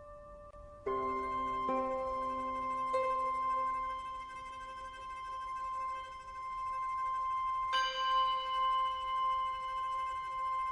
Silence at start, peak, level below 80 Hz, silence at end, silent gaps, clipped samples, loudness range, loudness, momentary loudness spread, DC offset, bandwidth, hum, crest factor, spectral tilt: 0 s; -22 dBFS; -60 dBFS; 0 s; none; under 0.1%; 6 LU; -36 LUFS; 13 LU; under 0.1%; 10.5 kHz; none; 14 dB; -3.5 dB/octave